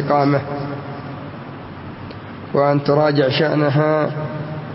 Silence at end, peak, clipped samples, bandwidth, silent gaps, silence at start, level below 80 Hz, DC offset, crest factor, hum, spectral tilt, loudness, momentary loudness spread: 0 s; -4 dBFS; under 0.1%; 5.8 kHz; none; 0 s; -54 dBFS; under 0.1%; 16 dB; none; -11 dB/octave; -18 LUFS; 17 LU